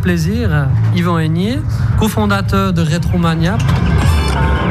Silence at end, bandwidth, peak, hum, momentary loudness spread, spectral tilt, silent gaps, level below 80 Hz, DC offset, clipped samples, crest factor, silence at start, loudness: 0 s; 15 kHz; -2 dBFS; none; 2 LU; -6.5 dB/octave; none; -22 dBFS; under 0.1%; under 0.1%; 12 dB; 0 s; -14 LUFS